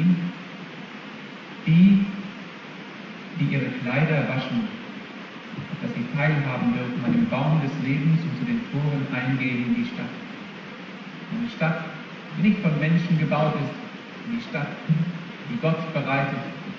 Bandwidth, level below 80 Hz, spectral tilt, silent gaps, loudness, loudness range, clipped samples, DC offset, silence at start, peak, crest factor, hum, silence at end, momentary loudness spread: 6.8 kHz; -60 dBFS; -8.5 dB/octave; none; -24 LUFS; 4 LU; under 0.1%; under 0.1%; 0 s; -8 dBFS; 18 dB; none; 0 s; 16 LU